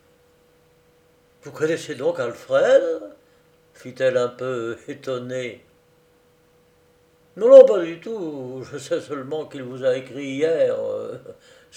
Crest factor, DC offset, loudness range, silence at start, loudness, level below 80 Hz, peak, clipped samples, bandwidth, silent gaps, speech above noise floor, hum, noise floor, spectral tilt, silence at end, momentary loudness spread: 22 dB; under 0.1%; 10 LU; 1.45 s; -20 LUFS; -72 dBFS; 0 dBFS; under 0.1%; 9.4 kHz; none; 38 dB; none; -58 dBFS; -5.5 dB/octave; 0.45 s; 18 LU